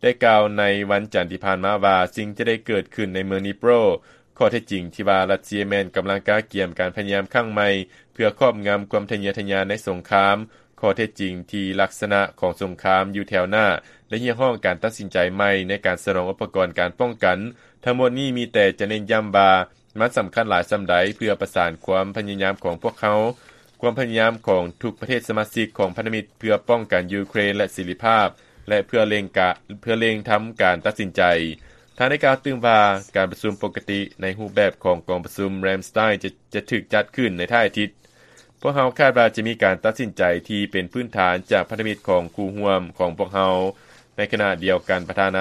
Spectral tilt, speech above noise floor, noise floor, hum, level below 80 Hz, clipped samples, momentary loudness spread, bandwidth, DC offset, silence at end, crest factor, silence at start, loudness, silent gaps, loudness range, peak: -5.5 dB/octave; 31 dB; -52 dBFS; none; -56 dBFS; under 0.1%; 8 LU; 13 kHz; under 0.1%; 0 s; 20 dB; 0 s; -21 LUFS; none; 3 LU; 0 dBFS